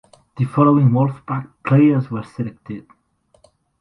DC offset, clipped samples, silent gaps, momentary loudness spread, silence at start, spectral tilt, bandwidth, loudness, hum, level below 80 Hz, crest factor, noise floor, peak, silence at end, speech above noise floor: under 0.1%; under 0.1%; none; 17 LU; 0.35 s; -10.5 dB/octave; 5.6 kHz; -18 LUFS; none; -56 dBFS; 18 dB; -57 dBFS; 0 dBFS; 1 s; 40 dB